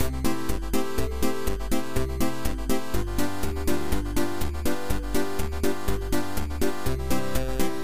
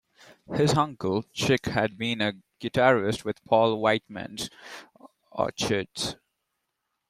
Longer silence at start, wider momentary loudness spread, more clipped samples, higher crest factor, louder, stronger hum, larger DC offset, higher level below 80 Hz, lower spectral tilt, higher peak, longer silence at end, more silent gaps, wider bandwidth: second, 0 s vs 0.5 s; second, 2 LU vs 15 LU; neither; second, 14 dB vs 20 dB; second, -29 LUFS vs -26 LUFS; neither; first, 5% vs under 0.1%; first, -32 dBFS vs -58 dBFS; about the same, -5 dB/octave vs -5 dB/octave; about the same, -10 dBFS vs -8 dBFS; second, 0 s vs 0.95 s; neither; about the same, 16 kHz vs 15 kHz